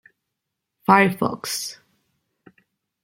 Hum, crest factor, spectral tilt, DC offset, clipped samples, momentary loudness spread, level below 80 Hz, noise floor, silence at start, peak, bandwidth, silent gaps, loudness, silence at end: none; 24 dB; -4.5 dB/octave; under 0.1%; under 0.1%; 13 LU; -64 dBFS; -81 dBFS; 0.9 s; -2 dBFS; 16.5 kHz; none; -20 LUFS; 1.3 s